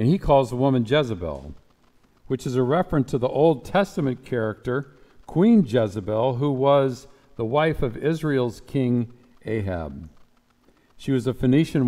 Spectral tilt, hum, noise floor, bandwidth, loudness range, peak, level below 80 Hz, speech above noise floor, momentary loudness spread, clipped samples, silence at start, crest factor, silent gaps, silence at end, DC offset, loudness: -7.5 dB/octave; none; -60 dBFS; 14.5 kHz; 4 LU; -6 dBFS; -44 dBFS; 38 dB; 13 LU; under 0.1%; 0 s; 16 dB; none; 0 s; under 0.1%; -23 LUFS